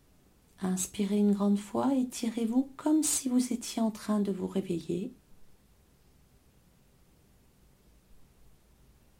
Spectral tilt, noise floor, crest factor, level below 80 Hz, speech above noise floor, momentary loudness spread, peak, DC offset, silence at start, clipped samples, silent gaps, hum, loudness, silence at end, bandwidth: -5 dB/octave; -63 dBFS; 16 dB; -64 dBFS; 33 dB; 8 LU; -16 dBFS; under 0.1%; 0.6 s; under 0.1%; none; none; -30 LUFS; 1 s; 16.5 kHz